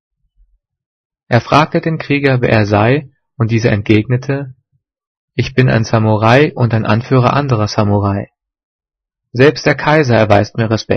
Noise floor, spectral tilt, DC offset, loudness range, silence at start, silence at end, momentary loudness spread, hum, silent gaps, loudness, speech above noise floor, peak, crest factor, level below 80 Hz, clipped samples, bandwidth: -80 dBFS; -7 dB/octave; under 0.1%; 2 LU; 1.3 s; 0 s; 9 LU; none; 5.07-5.28 s, 8.64-8.79 s; -13 LUFS; 69 dB; 0 dBFS; 14 dB; -44 dBFS; 0.1%; 6.6 kHz